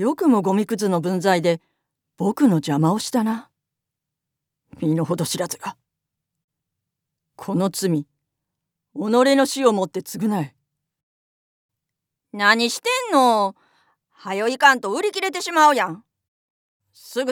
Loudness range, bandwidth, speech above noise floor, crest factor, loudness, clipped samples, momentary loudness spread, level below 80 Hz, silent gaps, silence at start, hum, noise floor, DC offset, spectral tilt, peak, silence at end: 9 LU; 20 kHz; 64 dB; 22 dB; -20 LUFS; under 0.1%; 13 LU; -76 dBFS; 6.44-6.48 s, 11.03-11.69 s, 16.28-16.80 s; 0 s; none; -83 dBFS; under 0.1%; -4.5 dB/octave; 0 dBFS; 0 s